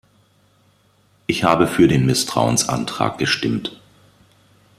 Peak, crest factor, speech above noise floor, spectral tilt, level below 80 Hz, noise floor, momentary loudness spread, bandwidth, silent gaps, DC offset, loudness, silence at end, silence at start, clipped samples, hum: -2 dBFS; 20 dB; 40 dB; -4.5 dB/octave; -48 dBFS; -58 dBFS; 10 LU; 15.5 kHz; none; under 0.1%; -18 LUFS; 1.05 s; 1.3 s; under 0.1%; none